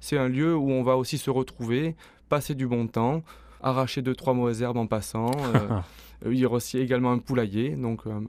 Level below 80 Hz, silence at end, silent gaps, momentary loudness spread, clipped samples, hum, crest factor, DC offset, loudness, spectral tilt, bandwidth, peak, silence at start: -52 dBFS; 0 s; none; 7 LU; under 0.1%; none; 18 dB; under 0.1%; -27 LUFS; -6.5 dB/octave; 15 kHz; -8 dBFS; 0 s